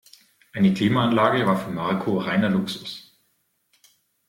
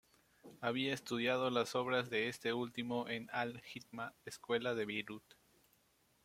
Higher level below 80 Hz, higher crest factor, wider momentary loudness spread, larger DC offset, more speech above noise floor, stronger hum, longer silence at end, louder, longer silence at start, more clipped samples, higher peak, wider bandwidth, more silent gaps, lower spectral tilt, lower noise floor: first, -60 dBFS vs -78 dBFS; about the same, 20 dB vs 20 dB; first, 15 LU vs 12 LU; neither; first, 48 dB vs 35 dB; neither; first, 1.3 s vs 1.05 s; first, -22 LUFS vs -39 LUFS; about the same, 0.55 s vs 0.45 s; neither; first, -4 dBFS vs -20 dBFS; about the same, 15.5 kHz vs 16 kHz; neither; first, -7 dB/octave vs -4.5 dB/octave; second, -70 dBFS vs -75 dBFS